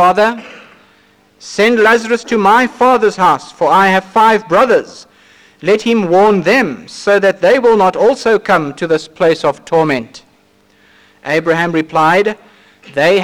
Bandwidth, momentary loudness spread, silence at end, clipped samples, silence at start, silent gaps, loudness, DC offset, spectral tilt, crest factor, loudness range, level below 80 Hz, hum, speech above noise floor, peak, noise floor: 16 kHz; 9 LU; 0 s; under 0.1%; 0 s; none; -12 LUFS; under 0.1%; -5 dB/octave; 10 dB; 5 LU; -52 dBFS; none; 40 dB; -2 dBFS; -51 dBFS